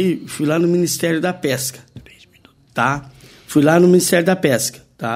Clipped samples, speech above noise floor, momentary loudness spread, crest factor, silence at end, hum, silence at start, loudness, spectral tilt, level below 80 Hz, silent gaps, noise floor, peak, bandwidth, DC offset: under 0.1%; 35 dB; 12 LU; 16 dB; 0 s; none; 0 s; -17 LUFS; -5 dB/octave; -54 dBFS; none; -51 dBFS; 0 dBFS; 16 kHz; under 0.1%